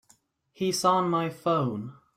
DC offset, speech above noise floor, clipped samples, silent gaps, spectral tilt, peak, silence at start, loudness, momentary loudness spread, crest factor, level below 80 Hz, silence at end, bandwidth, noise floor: under 0.1%; 38 dB; under 0.1%; none; -5 dB/octave; -10 dBFS; 0.6 s; -26 LUFS; 8 LU; 18 dB; -68 dBFS; 0.25 s; 16 kHz; -65 dBFS